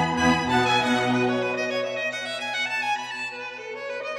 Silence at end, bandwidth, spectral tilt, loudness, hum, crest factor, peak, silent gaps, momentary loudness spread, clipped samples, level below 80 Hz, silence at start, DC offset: 0 s; 13.5 kHz; -4 dB/octave; -24 LUFS; none; 16 dB; -10 dBFS; none; 11 LU; under 0.1%; -56 dBFS; 0 s; under 0.1%